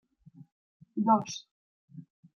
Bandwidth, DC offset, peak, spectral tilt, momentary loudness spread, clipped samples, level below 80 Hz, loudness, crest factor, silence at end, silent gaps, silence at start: 7.2 kHz; under 0.1%; -12 dBFS; -5.5 dB/octave; 25 LU; under 0.1%; -80 dBFS; -30 LUFS; 22 dB; 0.35 s; 1.51-1.88 s; 0.95 s